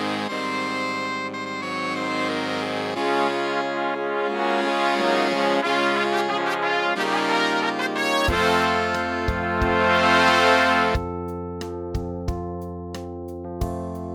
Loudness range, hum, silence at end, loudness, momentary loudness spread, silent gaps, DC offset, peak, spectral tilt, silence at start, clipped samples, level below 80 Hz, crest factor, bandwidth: 6 LU; none; 0 s; -22 LUFS; 13 LU; none; under 0.1%; -4 dBFS; -4.5 dB/octave; 0 s; under 0.1%; -40 dBFS; 18 dB; 18 kHz